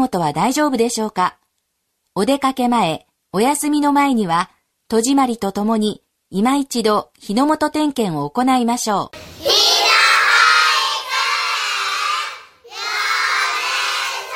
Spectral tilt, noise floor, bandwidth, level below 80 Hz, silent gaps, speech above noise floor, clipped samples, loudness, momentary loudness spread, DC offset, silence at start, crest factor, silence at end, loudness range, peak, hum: -3 dB/octave; -71 dBFS; 16.5 kHz; -58 dBFS; none; 54 dB; under 0.1%; -16 LUFS; 12 LU; under 0.1%; 0 s; 16 dB; 0 s; 5 LU; -2 dBFS; none